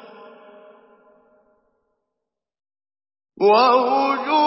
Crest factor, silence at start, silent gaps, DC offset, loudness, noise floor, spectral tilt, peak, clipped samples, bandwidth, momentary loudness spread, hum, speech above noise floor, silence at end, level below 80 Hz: 18 dB; 3.4 s; none; under 0.1%; -17 LUFS; -83 dBFS; -7.5 dB/octave; -4 dBFS; under 0.1%; 5.8 kHz; 6 LU; none; 67 dB; 0 s; -82 dBFS